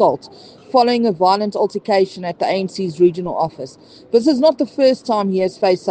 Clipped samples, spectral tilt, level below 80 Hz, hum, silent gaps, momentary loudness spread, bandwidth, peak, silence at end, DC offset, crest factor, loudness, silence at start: under 0.1%; -6 dB/octave; -64 dBFS; none; none; 7 LU; 9.2 kHz; 0 dBFS; 0 s; under 0.1%; 16 dB; -17 LUFS; 0 s